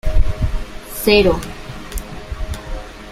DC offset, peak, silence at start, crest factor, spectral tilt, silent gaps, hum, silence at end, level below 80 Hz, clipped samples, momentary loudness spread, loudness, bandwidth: under 0.1%; 0 dBFS; 0.05 s; 18 dB; -5 dB/octave; none; none; 0 s; -22 dBFS; under 0.1%; 19 LU; -19 LUFS; 15.5 kHz